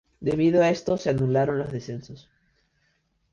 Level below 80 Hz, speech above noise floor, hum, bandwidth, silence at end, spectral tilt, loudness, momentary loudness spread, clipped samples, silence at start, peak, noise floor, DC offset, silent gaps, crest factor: -54 dBFS; 46 dB; none; 7.6 kHz; 1.15 s; -7.5 dB/octave; -24 LUFS; 15 LU; under 0.1%; 0.2 s; -10 dBFS; -70 dBFS; under 0.1%; none; 16 dB